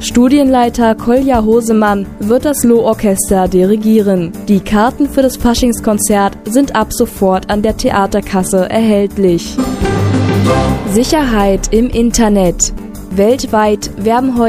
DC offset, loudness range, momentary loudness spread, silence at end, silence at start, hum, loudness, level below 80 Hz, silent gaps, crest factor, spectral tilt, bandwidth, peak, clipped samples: under 0.1%; 2 LU; 4 LU; 0 s; 0 s; none; -11 LUFS; -26 dBFS; none; 10 dB; -5.5 dB/octave; 15.5 kHz; 0 dBFS; under 0.1%